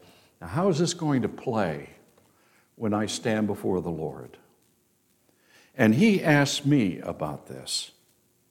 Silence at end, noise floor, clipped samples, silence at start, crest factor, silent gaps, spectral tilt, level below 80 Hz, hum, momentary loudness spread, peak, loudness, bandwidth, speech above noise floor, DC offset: 0.6 s; -67 dBFS; under 0.1%; 0.4 s; 20 dB; none; -5.5 dB/octave; -62 dBFS; none; 16 LU; -8 dBFS; -26 LUFS; 16 kHz; 42 dB; under 0.1%